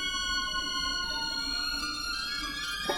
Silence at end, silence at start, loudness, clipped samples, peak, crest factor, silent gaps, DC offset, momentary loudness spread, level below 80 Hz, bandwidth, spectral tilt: 0 s; 0 s; -30 LUFS; under 0.1%; -16 dBFS; 16 dB; none; under 0.1%; 3 LU; -48 dBFS; 18.5 kHz; -0.5 dB/octave